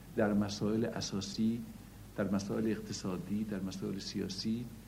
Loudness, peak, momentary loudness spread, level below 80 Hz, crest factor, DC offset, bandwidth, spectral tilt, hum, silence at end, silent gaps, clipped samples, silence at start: -36 LUFS; -16 dBFS; 7 LU; -58 dBFS; 20 dB; under 0.1%; 16 kHz; -5.5 dB/octave; none; 0 s; none; under 0.1%; 0 s